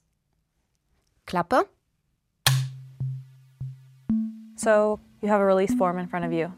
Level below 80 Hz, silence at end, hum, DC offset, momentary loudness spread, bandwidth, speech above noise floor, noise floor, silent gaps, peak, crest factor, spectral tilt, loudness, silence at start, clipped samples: -58 dBFS; 0 s; none; under 0.1%; 18 LU; 16 kHz; 51 dB; -74 dBFS; none; -4 dBFS; 22 dB; -5 dB/octave; -25 LUFS; 1.25 s; under 0.1%